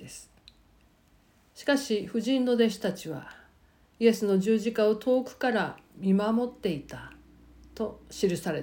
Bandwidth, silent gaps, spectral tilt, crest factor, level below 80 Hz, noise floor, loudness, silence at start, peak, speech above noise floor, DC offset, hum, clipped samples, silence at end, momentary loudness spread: 17 kHz; none; -5.5 dB/octave; 18 dB; -60 dBFS; -62 dBFS; -28 LUFS; 0 s; -10 dBFS; 35 dB; under 0.1%; none; under 0.1%; 0 s; 16 LU